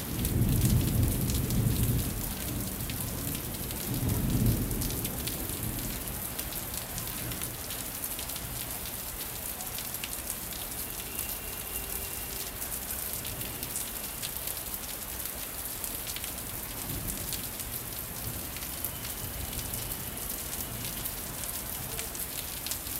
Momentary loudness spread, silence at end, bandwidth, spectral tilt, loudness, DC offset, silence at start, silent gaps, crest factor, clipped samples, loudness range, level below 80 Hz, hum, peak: 7 LU; 0 s; 16.5 kHz; -4 dB/octave; -33 LUFS; under 0.1%; 0 s; none; 24 dB; under 0.1%; 3 LU; -42 dBFS; none; -10 dBFS